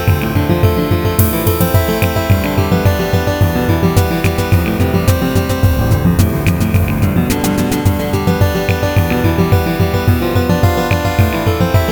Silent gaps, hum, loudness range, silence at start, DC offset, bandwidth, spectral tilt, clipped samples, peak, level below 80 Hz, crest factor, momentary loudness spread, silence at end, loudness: none; none; 1 LU; 0 s; under 0.1%; over 20 kHz; -6.5 dB/octave; under 0.1%; 0 dBFS; -24 dBFS; 12 dB; 2 LU; 0 s; -14 LUFS